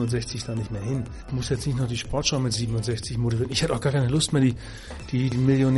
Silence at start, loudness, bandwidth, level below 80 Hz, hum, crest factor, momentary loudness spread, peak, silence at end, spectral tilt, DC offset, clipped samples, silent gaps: 0 s; -25 LUFS; 11.5 kHz; -42 dBFS; none; 16 dB; 9 LU; -8 dBFS; 0 s; -5.5 dB/octave; under 0.1%; under 0.1%; none